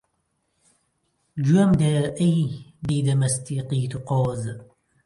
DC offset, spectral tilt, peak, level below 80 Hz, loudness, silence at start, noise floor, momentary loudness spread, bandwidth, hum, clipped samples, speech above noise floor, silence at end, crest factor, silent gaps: under 0.1%; -6.5 dB/octave; -8 dBFS; -52 dBFS; -23 LUFS; 1.35 s; -73 dBFS; 14 LU; 11.5 kHz; none; under 0.1%; 51 dB; 0.4 s; 16 dB; none